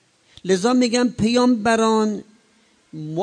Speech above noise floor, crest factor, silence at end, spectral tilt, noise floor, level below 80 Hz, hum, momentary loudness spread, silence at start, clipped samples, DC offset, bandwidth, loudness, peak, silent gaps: 40 dB; 16 dB; 0 s; -5 dB/octave; -58 dBFS; -54 dBFS; none; 16 LU; 0.45 s; under 0.1%; under 0.1%; 10 kHz; -19 LUFS; -4 dBFS; none